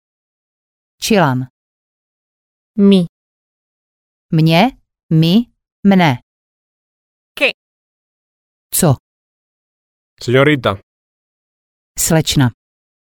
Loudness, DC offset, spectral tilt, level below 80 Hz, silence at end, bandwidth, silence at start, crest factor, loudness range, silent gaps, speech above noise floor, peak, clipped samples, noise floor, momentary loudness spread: -14 LUFS; under 0.1%; -5 dB/octave; -46 dBFS; 0.55 s; 17.5 kHz; 1 s; 16 dB; 5 LU; 1.50-2.74 s, 3.09-4.29 s, 5.03-5.09 s, 5.72-5.83 s, 6.23-7.35 s, 7.54-8.70 s, 9.00-10.17 s, 10.83-11.95 s; over 78 dB; 0 dBFS; under 0.1%; under -90 dBFS; 14 LU